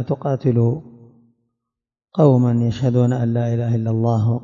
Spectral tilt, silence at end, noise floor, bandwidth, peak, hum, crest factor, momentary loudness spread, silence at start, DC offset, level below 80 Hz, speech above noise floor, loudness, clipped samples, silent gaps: -9.5 dB/octave; 0 s; -83 dBFS; 7.2 kHz; -2 dBFS; none; 16 dB; 7 LU; 0 s; under 0.1%; -56 dBFS; 66 dB; -18 LUFS; under 0.1%; none